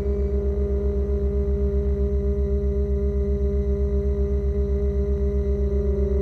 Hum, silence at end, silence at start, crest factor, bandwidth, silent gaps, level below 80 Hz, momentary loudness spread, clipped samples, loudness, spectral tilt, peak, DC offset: 50 Hz at -45 dBFS; 0 s; 0 s; 10 dB; 4.1 kHz; none; -24 dBFS; 1 LU; under 0.1%; -24 LUFS; -11 dB/octave; -12 dBFS; under 0.1%